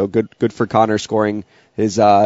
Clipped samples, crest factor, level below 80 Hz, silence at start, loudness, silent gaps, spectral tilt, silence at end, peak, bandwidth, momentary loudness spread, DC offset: under 0.1%; 16 dB; -56 dBFS; 0 s; -17 LUFS; none; -5.5 dB/octave; 0 s; 0 dBFS; 8 kHz; 9 LU; under 0.1%